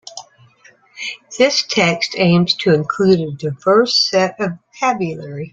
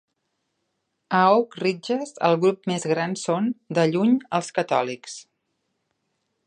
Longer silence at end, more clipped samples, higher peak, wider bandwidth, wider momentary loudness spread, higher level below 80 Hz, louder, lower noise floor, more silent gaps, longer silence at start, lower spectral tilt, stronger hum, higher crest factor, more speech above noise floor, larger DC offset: second, 0.05 s vs 1.25 s; neither; first, 0 dBFS vs -4 dBFS; second, 7.8 kHz vs 10 kHz; first, 14 LU vs 9 LU; first, -56 dBFS vs -76 dBFS; first, -16 LUFS vs -23 LUFS; second, -50 dBFS vs -76 dBFS; neither; second, 0.05 s vs 1.1 s; about the same, -4.5 dB/octave vs -5.5 dB/octave; neither; about the same, 16 dB vs 20 dB; second, 34 dB vs 54 dB; neither